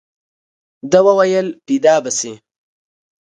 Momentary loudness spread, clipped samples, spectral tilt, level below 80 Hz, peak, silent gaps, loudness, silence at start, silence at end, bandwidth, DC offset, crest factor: 11 LU; under 0.1%; -4 dB/octave; -62 dBFS; 0 dBFS; none; -14 LUFS; 0.85 s; 1 s; 9.8 kHz; under 0.1%; 16 dB